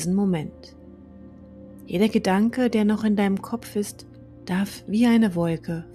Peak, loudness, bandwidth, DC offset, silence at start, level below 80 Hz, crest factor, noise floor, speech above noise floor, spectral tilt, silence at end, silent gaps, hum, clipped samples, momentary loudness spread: -8 dBFS; -23 LUFS; 14 kHz; under 0.1%; 0 s; -54 dBFS; 16 dB; -45 dBFS; 22 dB; -6.5 dB/octave; 0 s; none; none; under 0.1%; 13 LU